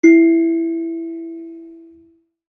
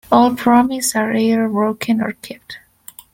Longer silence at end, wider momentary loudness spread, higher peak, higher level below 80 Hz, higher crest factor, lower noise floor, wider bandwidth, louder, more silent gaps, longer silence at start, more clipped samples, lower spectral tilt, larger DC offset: first, 0.8 s vs 0.55 s; first, 23 LU vs 20 LU; about the same, -2 dBFS vs 0 dBFS; second, -72 dBFS vs -54 dBFS; about the same, 16 dB vs 16 dB; first, -53 dBFS vs -42 dBFS; second, 6.4 kHz vs 17 kHz; about the same, -16 LUFS vs -16 LUFS; neither; about the same, 0.05 s vs 0.1 s; neither; about the same, -5.5 dB/octave vs -4.5 dB/octave; neither